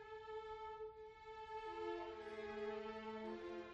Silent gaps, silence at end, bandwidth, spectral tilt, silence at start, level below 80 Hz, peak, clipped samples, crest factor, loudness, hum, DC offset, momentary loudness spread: none; 0 s; 8 kHz; -5.5 dB/octave; 0 s; -72 dBFS; -34 dBFS; under 0.1%; 16 dB; -50 LUFS; none; under 0.1%; 7 LU